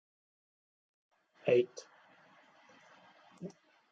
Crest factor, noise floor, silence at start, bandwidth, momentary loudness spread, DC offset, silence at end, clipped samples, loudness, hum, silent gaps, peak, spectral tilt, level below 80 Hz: 24 dB; -64 dBFS; 1.45 s; 7.6 kHz; 20 LU; under 0.1%; 0.4 s; under 0.1%; -33 LUFS; none; none; -16 dBFS; -6 dB/octave; -90 dBFS